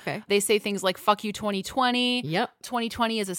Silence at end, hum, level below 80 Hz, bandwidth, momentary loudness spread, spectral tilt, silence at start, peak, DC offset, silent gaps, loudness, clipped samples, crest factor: 0 s; none; -60 dBFS; 17 kHz; 7 LU; -3.5 dB/octave; 0 s; -8 dBFS; under 0.1%; none; -25 LUFS; under 0.1%; 18 dB